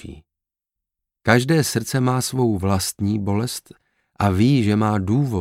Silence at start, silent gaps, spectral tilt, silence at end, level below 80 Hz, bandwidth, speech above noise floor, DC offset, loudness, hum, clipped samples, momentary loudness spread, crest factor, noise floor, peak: 0.05 s; none; -5.5 dB/octave; 0 s; -50 dBFS; 16.5 kHz; 67 dB; under 0.1%; -20 LUFS; none; under 0.1%; 8 LU; 20 dB; -86 dBFS; 0 dBFS